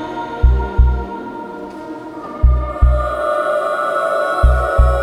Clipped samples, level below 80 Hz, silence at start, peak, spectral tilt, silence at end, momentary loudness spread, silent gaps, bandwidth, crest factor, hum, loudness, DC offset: under 0.1%; -16 dBFS; 0 s; 0 dBFS; -7.5 dB/octave; 0 s; 14 LU; none; 10 kHz; 14 dB; none; -17 LUFS; under 0.1%